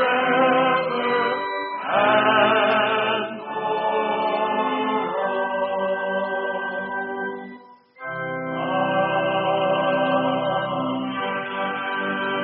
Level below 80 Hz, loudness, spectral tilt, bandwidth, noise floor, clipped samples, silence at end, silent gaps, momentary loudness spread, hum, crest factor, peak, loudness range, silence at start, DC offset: -66 dBFS; -22 LUFS; -2 dB/octave; 4.6 kHz; -45 dBFS; under 0.1%; 0 s; none; 10 LU; none; 18 dB; -4 dBFS; 6 LU; 0 s; under 0.1%